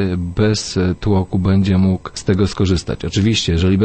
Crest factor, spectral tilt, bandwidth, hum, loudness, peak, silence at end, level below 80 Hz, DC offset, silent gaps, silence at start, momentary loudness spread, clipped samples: 14 dB; -6 dB/octave; 8.8 kHz; none; -17 LUFS; -2 dBFS; 0 s; -34 dBFS; under 0.1%; none; 0 s; 5 LU; under 0.1%